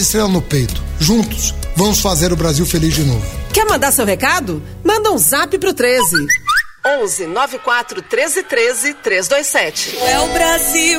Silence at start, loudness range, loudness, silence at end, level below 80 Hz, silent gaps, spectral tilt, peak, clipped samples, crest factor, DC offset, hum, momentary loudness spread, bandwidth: 0 s; 2 LU; -14 LUFS; 0 s; -28 dBFS; none; -3.5 dB/octave; 0 dBFS; under 0.1%; 14 dB; 0.3%; none; 6 LU; 16.5 kHz